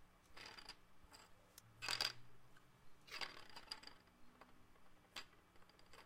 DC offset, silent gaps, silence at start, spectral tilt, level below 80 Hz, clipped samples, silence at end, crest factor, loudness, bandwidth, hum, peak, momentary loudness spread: under 0.1%; none; 0 s; -0.5 dB/octave; -74 dBFS; under 0.1%; 0 s; 32 dB; -49 LUFS; 16 kHz; none; -22 dBFS; 25 LU